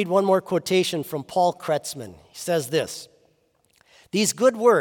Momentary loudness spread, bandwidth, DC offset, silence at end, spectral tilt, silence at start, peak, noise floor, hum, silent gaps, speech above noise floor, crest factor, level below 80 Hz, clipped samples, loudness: 15 LU; 18 kHz; under 0.1%; 0 s; -4 dB/octave; 0 s; -4 dBFS; -65 dBFS; none; none; 43 dB; 18 dB; -70 dBFS; under 0.1%; -23 LUFS